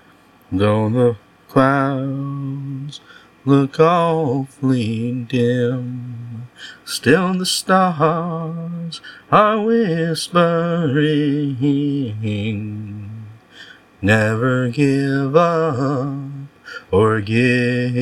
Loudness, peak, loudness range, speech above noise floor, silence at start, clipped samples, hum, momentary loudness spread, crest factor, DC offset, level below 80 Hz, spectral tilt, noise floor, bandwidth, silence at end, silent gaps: -18 LUFS; 0 dBFS; 3 LU; 32 dB; 0.5 s; under 0.1%; none; 16 LU; 18 dB; under 0.1%; -58 dBFS; -6.5 dB/octave; -50 dBFS; 16.5 kHz; 0 s; none